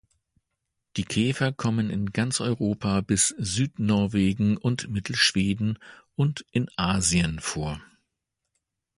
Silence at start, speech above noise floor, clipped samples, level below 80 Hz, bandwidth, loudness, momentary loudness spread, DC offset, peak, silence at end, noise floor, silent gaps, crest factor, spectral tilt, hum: 0.95 s; 57 dB; under 0.1%; -48 dBFS; 11.5 kHz; -25 LUFS; 8 LU; under 0.1%; -6 dBFS; 1.15 s; -82 dBFS; none; 20 dB; -4 dB/octave; none